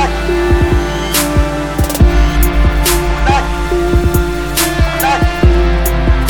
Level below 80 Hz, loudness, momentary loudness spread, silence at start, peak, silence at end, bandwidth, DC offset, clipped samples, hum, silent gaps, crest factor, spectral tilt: -14 dBFS; -13 LUFS; 4 LU; 0 s; 0 dBFS; 0 s; over 20 kHz; under 0.1%; under 0.1%; none; none; 12 dB; -5 dB/octave